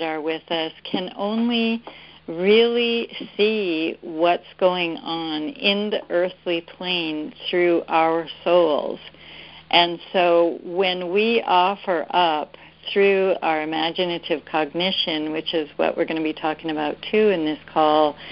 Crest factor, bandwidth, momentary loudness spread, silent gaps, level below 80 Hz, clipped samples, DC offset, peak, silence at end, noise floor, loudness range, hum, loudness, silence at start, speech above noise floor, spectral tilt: 20 dB; 5.6 kHz; 10 LU; none; -62 dBFS; under 0.1%; under 0.1%; -2 dBFS; 0 s; -42 dBFS; 3 LU; none; -21 LUFS; 0 s; 21 dB; -9.5 dB/octave